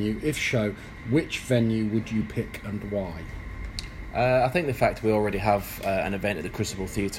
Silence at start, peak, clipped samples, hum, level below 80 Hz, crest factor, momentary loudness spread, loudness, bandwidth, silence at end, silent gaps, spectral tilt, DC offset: 0 s; -8 dBFS; under 0.1%; none; -42 dBFS; 20 dB; 13 LU; -27 LUFS; 16 kHz; 0 s; none; -6 dB/octave; under 0.1%